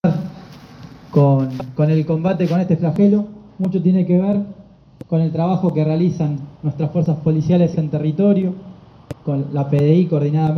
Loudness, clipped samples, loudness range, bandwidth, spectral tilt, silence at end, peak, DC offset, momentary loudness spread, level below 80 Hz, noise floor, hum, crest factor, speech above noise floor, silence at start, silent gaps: -18 LUFS; under 0.1%; 2 LU; 6.2 kHz; -10 dB/octave; 0 s; -2 dBFS; under 0.1%; 10 LU; -52 dBFS; -39 dBFS; none; 16 dB; 22 dB; 0.05 s; none